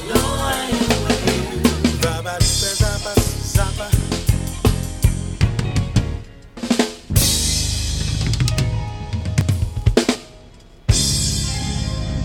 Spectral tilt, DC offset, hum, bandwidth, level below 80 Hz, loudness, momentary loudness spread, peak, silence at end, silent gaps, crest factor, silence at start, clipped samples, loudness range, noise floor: -4.5 dB/octave; under 0.1%; none; 17.5 kHz; -26 dBFS; -19 LUFS; 6 LU; -2 dBFS; 0 s; none; 16 dB; 0 s; under 0.1%; 2 LU; -43 dBFS